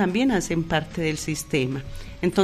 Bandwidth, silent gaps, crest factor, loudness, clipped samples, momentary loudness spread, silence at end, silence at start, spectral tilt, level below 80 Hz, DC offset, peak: 13 kHz; none; 18 dB; -25 LUFS; under 0.1%; 7 LU; 0 s; 0 s; -5 dB/octave; -42 dBFS; under 0.1%; -6 dBFS